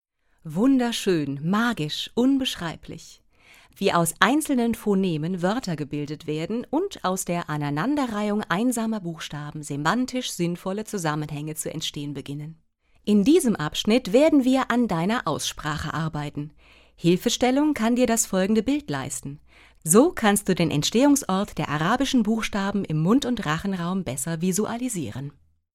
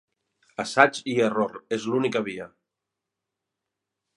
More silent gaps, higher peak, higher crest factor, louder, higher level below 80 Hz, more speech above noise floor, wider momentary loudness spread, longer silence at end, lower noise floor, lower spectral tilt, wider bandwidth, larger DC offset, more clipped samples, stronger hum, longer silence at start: neither; about the same, 0 dBFS vs 0 dBFS; about the same, 22 dB vs 26 dB; about the same, -24 LUFS vs -24 LUFS; first, -52 dBFS vs -72 dBFS; second, 31 dB vs 61 dB; second, 13 LU vs 18 LU; second, 0.45 s vs 1.7 s; second, -54 dBFS vs -85 dBFS; about the same, -4.5 dB/octave vs -4.5 dB/octave; first, 16.5 kHz vs 11.5 kHz; neither; neither; neither; second, 0.45 s vs 0.6 s